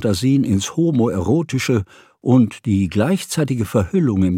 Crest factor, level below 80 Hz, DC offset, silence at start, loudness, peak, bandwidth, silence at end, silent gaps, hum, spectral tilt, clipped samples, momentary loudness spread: 16 dB; -46 dBFS; under 0.1%; 0 s; -18 LUFS; -2 dBFS; 16.5 kHz; 0 s; none; none; -6.5 dB/octave; under 0.1%; 5 LU